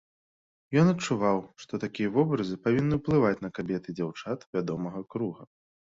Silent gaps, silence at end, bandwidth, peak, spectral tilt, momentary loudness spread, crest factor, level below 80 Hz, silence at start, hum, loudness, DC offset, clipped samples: 4.46-4.53 s; 0.4 s; 7.8 kHz; -10 dBFS; -7 dB/octave; 11 LU; 18 dB; -58 dBFS; 0.7 s; none; -29 LUFS; under 0.1%; under 0.1%